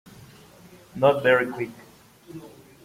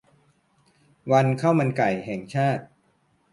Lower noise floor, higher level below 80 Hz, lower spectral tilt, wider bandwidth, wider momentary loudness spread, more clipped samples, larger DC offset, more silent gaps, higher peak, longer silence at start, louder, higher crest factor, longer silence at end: second, -50 dBFS vs -66 dBFS; about the same, -64 dBFS vs -64 dBFS; second, -6 dB/octave vs -7.5 dB/octave; first, 16 kHz vs 11.5 kHz; first, 24 LU vs 10 LU; neither; neither; neither; about the same, -4 dBFS vs -6 dBFS; second, 0.2 s vs 1.05 s; about the same, -22 LUFS vs -23 LUFS; about the same, 22 dB vs 20 dB; second, 0.35 s vs 0.65 s